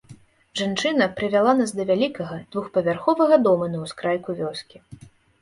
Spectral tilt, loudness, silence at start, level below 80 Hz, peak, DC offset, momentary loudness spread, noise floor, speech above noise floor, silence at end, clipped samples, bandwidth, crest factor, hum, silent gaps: -5.5 dB/octave; -22 LUFS; 0.1 s; -60 dBFS; -4 dBFS; under 0.1%; 13 LU; -49 dBFS; 27 dB; 0.45 s; under 0.1%; 11.5 kHz; 18 dB; none; none